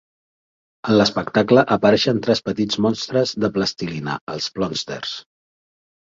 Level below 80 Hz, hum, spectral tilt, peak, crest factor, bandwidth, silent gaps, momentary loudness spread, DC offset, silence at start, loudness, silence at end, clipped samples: -54 dBFS; none; -5 dB/octave; -2 dBFS; 20 dB; 7.8 kHz; 4.21-4.27 s; 12 LU; under 0.1%; 0.85 s; -19 LUFS; 0.9 s; under 0.1%